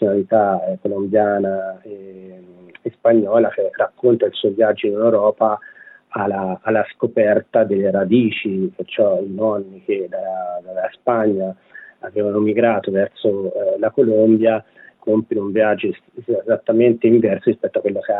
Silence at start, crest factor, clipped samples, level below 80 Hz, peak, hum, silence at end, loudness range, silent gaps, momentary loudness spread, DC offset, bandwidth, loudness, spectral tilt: 0 s; 16 dB; under 0.1%; -72 dBFS; -2 dBFS; none; 0 s; 3 LU; none; 11 LU; under 0.1%; 4 kHz; -18 LUFS; -10.5 dB/octave